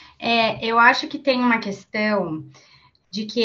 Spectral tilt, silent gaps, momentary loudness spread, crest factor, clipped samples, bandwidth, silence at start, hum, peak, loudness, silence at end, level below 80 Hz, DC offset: -4.5 dB/octave; none; 15 LU; 20 dB; under 0.1%; 7.4 kHz; 0.2 s; none; -2 dBFS; -20 LUFS; 0 s; -62 dBFS; under 0.1%